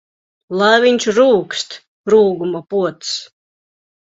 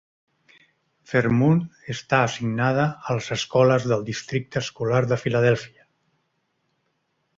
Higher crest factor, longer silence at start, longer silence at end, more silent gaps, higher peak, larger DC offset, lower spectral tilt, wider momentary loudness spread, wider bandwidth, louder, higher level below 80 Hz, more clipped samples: about the same, 16 dB vs 20 dB; second, 0.5 s vs 1.1 s; second, 0.8 s vs 1.7 s; first, 1.88-2.04 s vs none; first, 0 dBFS vs -4 dBFS; neither; second, -4 dB/octave vs -6 dB/octave; first, 13 LU vs 9 LU; about the same, 8 kHz vs 7.8 kHz; first, -15 LUFS vs -22 LUFS; about the same, -60 dBFS vs -58 dBFS; neither